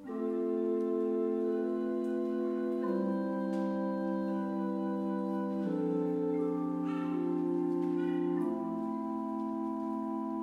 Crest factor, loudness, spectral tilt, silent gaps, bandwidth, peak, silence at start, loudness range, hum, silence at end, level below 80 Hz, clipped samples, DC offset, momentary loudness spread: 12 dB; -34 LUFS; -9.5 dB/octave; none; 6.8 kHz; -22 dBFS; 0 s; 1 LU; none; 0 s; -74 dBFS; under 0.1%; under 0.1%; 4 LU